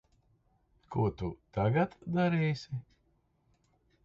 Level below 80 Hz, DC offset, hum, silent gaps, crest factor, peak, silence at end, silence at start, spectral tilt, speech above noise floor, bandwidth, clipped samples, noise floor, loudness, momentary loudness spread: -56 dBFS; under 0.1%; none; none; 18 dB; -16 dBFS; 1.25 s; 0.9 s; -8.5 dB/octave; 41 dB; 7.4 kHz; under 0.1%; -73 dBFS; -32 LUFS; 11 LU